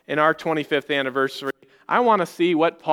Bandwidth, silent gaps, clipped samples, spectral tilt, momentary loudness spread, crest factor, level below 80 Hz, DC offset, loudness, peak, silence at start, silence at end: 17.5 kHz; none; under 0.1%; -5.5 dB/octave; 9 LU; 18 dB; -72 dBFS; under 0.1%; -21 LUFS; -4 dBFS; 0.1 s; 0 s